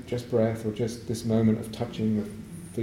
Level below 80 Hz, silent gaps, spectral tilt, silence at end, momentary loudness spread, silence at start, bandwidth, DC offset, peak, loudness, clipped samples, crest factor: -54 dBFS; none; -7 dB/octave; 0 s; 12 LU; 0 s; 15 kHz; under 0.1%; -12 dBFS; -28 LUFS; under 0.1%; 16 dB